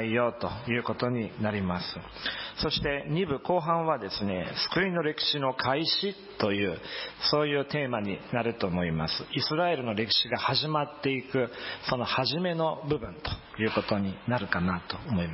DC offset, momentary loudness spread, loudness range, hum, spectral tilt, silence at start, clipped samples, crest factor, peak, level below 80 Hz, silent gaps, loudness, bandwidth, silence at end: under 0.1%; 7 LU; 2 LU; none; -8.5 dB/octave; 0 s; under 0.1%; 18 dB; -12 dBFS; -52 dBFS; none; -29 LUFS; 5.8 kHz; 0 s